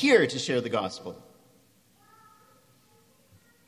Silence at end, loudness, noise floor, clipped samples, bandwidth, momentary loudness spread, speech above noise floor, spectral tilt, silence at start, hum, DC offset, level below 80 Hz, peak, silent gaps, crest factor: 2.55 s; -27 LUFS; -62 dBFS; under 0.1%; 14.5 kHz; 21 LU; 37 dB; -4 dB/octave; 0 s; none; under 0.1%; -70 dBFS; -8 dBFS; none; 24 dB